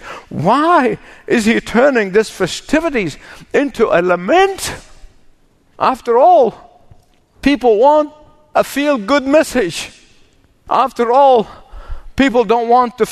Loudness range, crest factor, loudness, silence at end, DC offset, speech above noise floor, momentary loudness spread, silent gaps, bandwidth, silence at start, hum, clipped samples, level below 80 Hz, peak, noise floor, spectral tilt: 2 LU; 14 dB; -13 LUFS; 0 s; under 0.1%; 37 dB; 13 LU; none; 13.5 kHz; 0.05 s; none; under 0.1%; -40 dBFS; 0 dBFS; -50 dBFS; -5 dB/octave